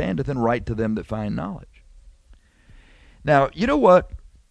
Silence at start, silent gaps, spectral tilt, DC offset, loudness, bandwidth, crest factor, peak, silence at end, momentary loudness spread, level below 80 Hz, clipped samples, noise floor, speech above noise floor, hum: 0 s; none; -7.5 dB/octave; under 0.1%; -21 LUFS; 8.8 kHz; 20 dB; -4 dBFS; 0.35 s; 16 LU; -42 dBFS; under 0.1%; -53 dBFS; 33 dB; none